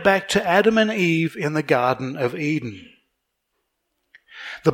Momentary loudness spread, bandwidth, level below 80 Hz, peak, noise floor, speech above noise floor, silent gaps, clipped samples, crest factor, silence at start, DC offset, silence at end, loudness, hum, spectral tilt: 11 LU; 16.5 kHz; -58 dBFS; -2 dBFS; -75 dBFS; 55 dB; none; under 0.1%; 20 dB; 0 s; under 0.1%; 0 s; -20 LUFS; none; -5.5 dB/octave